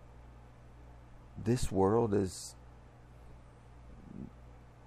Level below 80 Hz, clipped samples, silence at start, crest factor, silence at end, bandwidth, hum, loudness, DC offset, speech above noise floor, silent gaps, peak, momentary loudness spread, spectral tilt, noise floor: -52 dBFS; under 0.1%; 0.1 s; 20 dB; 0.2 s; 14.5 kHz; 60 Hz at -55 dBFS; -32 LUFS; under 0.1%; 24 dB; none; -16 dBFS; 27 LU; -6.5 dB/octave; -55 dBFS